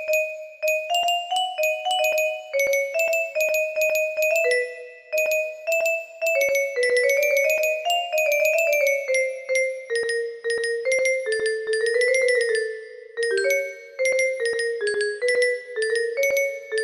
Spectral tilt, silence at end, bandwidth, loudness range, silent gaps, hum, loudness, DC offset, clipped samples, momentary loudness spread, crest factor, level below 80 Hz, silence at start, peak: 1 dB/octave; 0 s; 15.5 kHz; 3 LU; none; none; -22 LUFS; under 0.1%; under 0.1%; 6 LU; 14 dB; -72 dBFS; 0 s; -8 dBFS